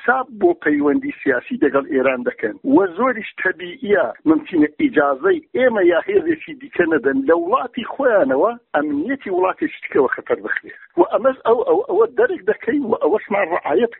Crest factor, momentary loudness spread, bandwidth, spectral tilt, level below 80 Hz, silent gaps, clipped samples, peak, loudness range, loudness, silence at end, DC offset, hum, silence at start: 16 dB; 6 LU; 4.1 kHz; -4 dB/octave; -58 dBFS; none; under 0.1%; -2 dBFS; 2 LU; -18 LUFS; 0.05 s; under 0.1%; none; 0 s